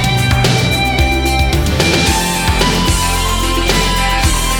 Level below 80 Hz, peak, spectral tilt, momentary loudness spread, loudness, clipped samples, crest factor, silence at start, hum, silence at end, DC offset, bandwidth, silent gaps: -18 dBFS; 0 dBFS; -4 dB/octave; 2 LU; -13 LUFS; under 0.1%; 12 dB; 0 s; none; 0 s; under 0.1%; over 20 kHz; none